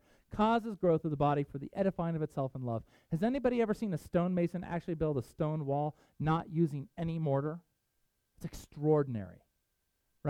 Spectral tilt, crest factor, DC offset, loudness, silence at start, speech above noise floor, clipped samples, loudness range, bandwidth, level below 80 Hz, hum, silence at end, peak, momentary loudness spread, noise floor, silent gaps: -8.5 dB/octave; 18 dB; under 0.1%; -34 LUFS; 0.3 s; 47 dB; under 0.1%; 3 LU; 13.5 kHz; -58 dBFS; none; 0 s; -16 dBFS; 10 LU; -80 dBFS; none